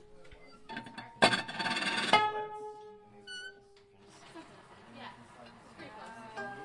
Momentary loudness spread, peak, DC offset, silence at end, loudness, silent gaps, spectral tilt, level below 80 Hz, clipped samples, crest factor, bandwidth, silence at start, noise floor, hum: 26 LU; -10 dBFS; under 0.1%; 0 s; -31 LUFS; none; -3 dB/octave; -70 dBFS; under 0.1%; 28 dB; 11.5 kHz; 0 s; -60 dBFS; none